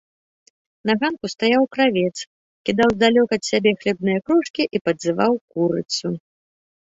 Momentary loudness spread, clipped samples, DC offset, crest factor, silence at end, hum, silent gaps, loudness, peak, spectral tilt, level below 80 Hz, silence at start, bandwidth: 10 LU; under 0.1%; under 0.1%; 18 dB; 0.65 s; none; 2.27-2.65 s, 4.50-4.54 s, 4.81-4.85 s, 5.41-5.48 s; -20 LUFS; -2 dBFS; -5 dB/octave; -58 dBFS; 0.85 s; 8 kHz